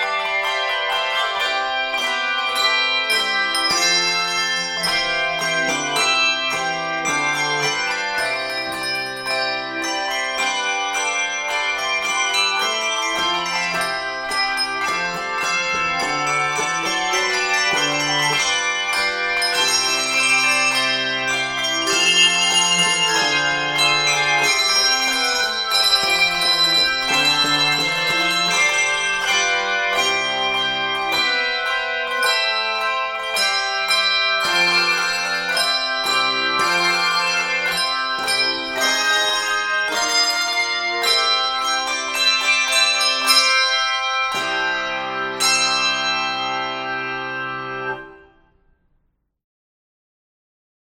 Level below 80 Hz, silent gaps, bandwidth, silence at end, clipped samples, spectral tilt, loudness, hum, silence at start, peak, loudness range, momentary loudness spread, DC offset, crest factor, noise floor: -54 dBFS; none; 16.5 kHz; 2.8 s; under 0.1%; 0 dB/octave; -17 LUFS; none; 0 s; -2 dBFS; 5 LU; 7 LU; under 0.1%; 18 dB; -66 dBFS